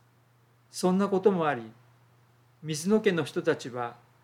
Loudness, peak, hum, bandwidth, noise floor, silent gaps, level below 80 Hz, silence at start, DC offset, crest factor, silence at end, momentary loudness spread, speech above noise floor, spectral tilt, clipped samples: -28 LUFS; -10 dBFS; none; 15.5 kHz; -63 dBFS; none; -80 dBFS; 0.75 s; under 0.1%; 20 dB; 0.3 s; 14 LU; 36 dB; -5.5 dB/octave; under 0.1%